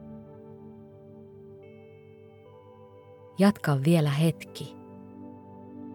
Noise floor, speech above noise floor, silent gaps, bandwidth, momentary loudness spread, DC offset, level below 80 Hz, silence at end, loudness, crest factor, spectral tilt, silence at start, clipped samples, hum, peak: -51 dBFS; 27 dB; none; 17 kHz; 26 LU; under 0.1%; -70 dBFS; 0 s; -25 LUFS; 22 dB; -7 dB/octave; 0 s; under 0.1%; none; -8 dBFS